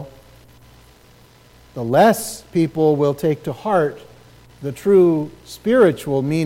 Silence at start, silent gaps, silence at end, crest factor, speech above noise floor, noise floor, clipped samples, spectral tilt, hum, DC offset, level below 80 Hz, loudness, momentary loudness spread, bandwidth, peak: 0 s; none; 0 s; 16 dB; 32 dB; -49 dBFS; under 0.1%; -6.5 dB/octave; none; under 0.1%; -54 dBFS; -18 LUFS; 16 LU; 16.5 kHz; -2 dBFS